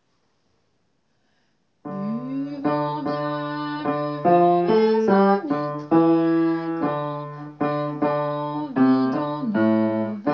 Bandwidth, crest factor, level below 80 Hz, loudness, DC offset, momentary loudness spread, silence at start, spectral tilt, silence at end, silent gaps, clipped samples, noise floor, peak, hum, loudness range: 6.2 kHz; 18 dB; -68 dBFS; -22 LUFS; under 0.1%; 11 LU; 1.85 s; -9 dB/octave; 0 s; none; under 0.1%; -70 dBFS; -6 dBFS; none; 9 LU